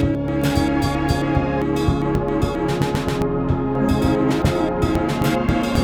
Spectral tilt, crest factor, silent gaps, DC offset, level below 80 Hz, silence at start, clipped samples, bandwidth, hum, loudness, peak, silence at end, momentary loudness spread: -7 dB/octave; 14 dB; none; under 0.1%; -30 dBFS; 0 s; under 0.1%; 18.5 kHz; none; -20 LUFS; -4 dBFS; 0 s; 3 LU